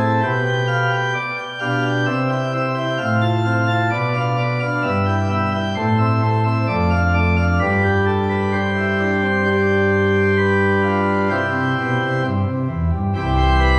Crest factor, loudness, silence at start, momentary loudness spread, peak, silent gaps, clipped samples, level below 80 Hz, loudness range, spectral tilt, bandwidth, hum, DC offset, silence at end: 14 dB; -18 LUFS; 0 s; 4 LU; -4 dBFS; none; under 0.1%; -32 dBFS; 2 LU; -7.5 dB/octave; 8.6 kHz; none; under 0.1%; 0 s